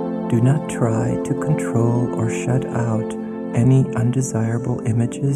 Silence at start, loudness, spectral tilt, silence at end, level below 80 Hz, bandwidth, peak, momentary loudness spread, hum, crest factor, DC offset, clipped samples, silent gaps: 0 s; -20 LUFS; -7.5 dB/octave; 0 s; -48 dBFS; 11.5 kHz; -4 dBFS; 6 LU; none; 14 dB; under 0.1%; under 0.1%; none